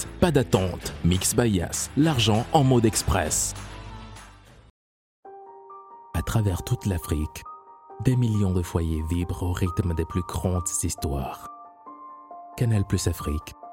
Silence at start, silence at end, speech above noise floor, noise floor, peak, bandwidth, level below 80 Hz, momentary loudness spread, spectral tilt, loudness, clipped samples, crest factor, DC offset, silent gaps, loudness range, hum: 0 s; 0 s; 25 dB; -48 dBFS; -6 dBFS; 16.5 kHz; -38 dBFS; 23 LU; -5 dB/octave; -25 LUFS; under 0.1%; 20 dB; under 0.1%; 4.70-5.23 s; 8 LU; none